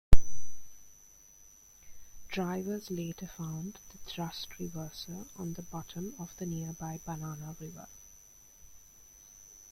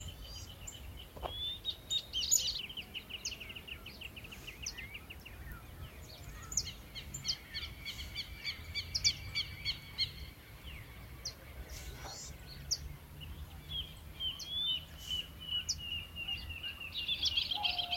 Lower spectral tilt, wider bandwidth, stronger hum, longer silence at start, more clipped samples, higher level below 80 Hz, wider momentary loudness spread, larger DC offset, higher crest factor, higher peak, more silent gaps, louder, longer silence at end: first, -5 dB/octave vs -0.5 dB/octave; second, 13.5 kHz vs 16.5 kHz; neither; about the same, 0.1 s vs 0 s; neither; first, -38 dBFS vs -54 dBFS; about the same, 19 LU vs 18 LU; neither; about the same, 24 dB vs 26 dB; first, -4 dBFS vs -16 dBFS; neither; about the same, -40 LUFS vs -38 LUFS; first, 1.9 s vs 0 s